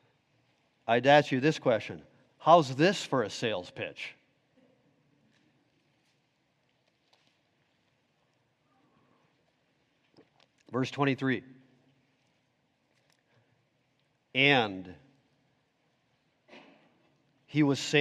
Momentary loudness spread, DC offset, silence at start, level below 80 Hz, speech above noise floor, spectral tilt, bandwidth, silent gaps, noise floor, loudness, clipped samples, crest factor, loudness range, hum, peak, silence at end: 19 LU; under 0.1%; 0.85 s; -78 dBFS; 47 dB; -5 dB/octave; 12 kHz; none; -74 dBFS; -27 LUFS; under 0.1%; 24 dB; 14 LU; none; -8 dBFS; 0 s